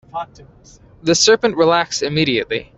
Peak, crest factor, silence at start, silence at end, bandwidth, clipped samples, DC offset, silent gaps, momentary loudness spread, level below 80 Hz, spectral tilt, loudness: -2 dBFS; 16 dB; 0.15 s; 0.1 s; 8.4 kHz; under 0.1%; under 0.1%; none; 17 LU; -50 dBFS; -3 dB/octave; -15 LUFS